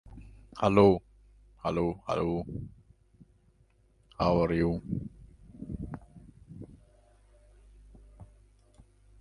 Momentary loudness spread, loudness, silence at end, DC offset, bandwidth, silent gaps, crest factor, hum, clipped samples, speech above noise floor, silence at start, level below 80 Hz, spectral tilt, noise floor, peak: 26 LU; -29 LUFS; 0.95 s; under 0.1%; 11 kHz; none; 26 dB; none; under 0.1%; 38 dB; 0.1 s; -50 dBFS; -8 dB/octave; -65 dBFS; -8 dBFS